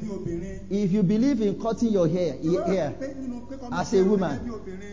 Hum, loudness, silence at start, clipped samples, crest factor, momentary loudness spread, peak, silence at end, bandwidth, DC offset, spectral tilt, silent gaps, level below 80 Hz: none; -25 LUFS; 0 s; under 0.1%; 14 dB; 13 LU; -10 dBFS; 0 s; 7.6 kHz; 0.8%; -7.5 dB/octave; none; -48 dBFS